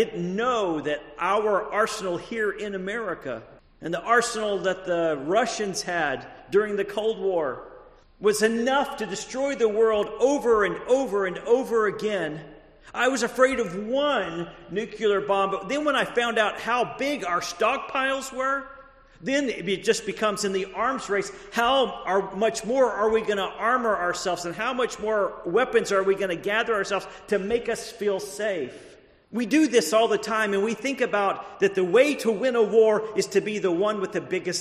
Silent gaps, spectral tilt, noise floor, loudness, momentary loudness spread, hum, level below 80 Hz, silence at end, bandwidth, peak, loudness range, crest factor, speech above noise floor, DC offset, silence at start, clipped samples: none; -3.5 dB/octave; -50 dBFS; -25 LUFS; 8 LU; none; -58 dBFS; 0 s; 13 kHz; -6 dBFS; 4 LU; 20 dB; 25 dB; under 0.1%; 0 s; under 0.1%